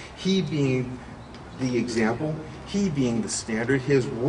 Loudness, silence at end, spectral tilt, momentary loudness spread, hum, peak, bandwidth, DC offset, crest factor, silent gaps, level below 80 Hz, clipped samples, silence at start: -26 LUFS; 0 s; -5.5 dB/octave; 12 LU; none; -8 dBFS; 11 kHz; under 0.1%; 18 dB; none; -50 dBFS; under 0.1%; 0 s